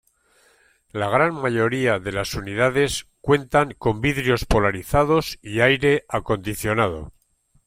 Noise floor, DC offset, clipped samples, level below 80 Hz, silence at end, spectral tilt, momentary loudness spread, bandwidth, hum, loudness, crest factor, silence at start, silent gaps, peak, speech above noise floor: -63 dBFS; under 0.1%; under 0.1%; -38 dBFS; 0.55 s; -5.5 dB/octave; 8 LU; 16.5 kHz; none; -21 LUFS; 18 dB; 0.95 s; none; -4 dBFS; 42 dB